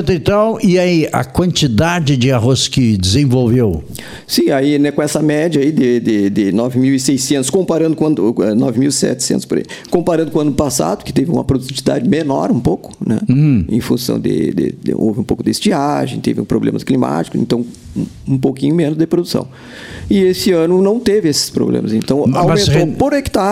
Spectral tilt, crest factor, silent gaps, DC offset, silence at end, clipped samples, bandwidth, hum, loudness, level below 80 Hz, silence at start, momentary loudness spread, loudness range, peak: -5.5 dB/octave; 14 dB; none; under 0.1%; 0 s; under 0.1%; 16.5 kHz; none; -14 LUFS; -38 dBFS; 0 s; 6 LU; 3 LU; 0 dBFS